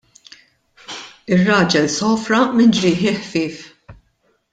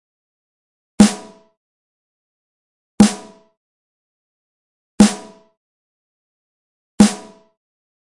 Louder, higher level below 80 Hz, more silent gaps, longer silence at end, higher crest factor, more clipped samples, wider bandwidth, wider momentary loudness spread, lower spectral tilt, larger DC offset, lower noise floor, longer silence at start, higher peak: about the same, -16 LUFS vs -15 LUFS; second, -54 dBFS vs -46 dBFS; second, none vs 1.57-2.98 s, 3.57-4.98 s, 5.57-6.98 s; second, 0.6 s vs 0.95 s; about the same, 16 dB vs 20 dB; neither; second, 9.2 kHz vs 11.5 kHz; about the same, 19 LU vs 19 LU; about the same, -5 dB/octave vs -5 dB/octave; neither; first, -63 dBFS vs -31 dBFS; about the same, 0.9 s vs 1 s; about the same, -2 dBFS vs 0 dBFS